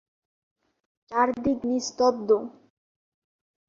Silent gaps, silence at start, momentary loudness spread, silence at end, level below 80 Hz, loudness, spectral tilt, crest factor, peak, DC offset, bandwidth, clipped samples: none; 1.1 s; 6 LU; 1.15 s; -60 dBFS; -25 LUFS; -4 dB/octave; 20 dB; -8 dBFS; under 0.1%; 7.6 kHz; under 0.1%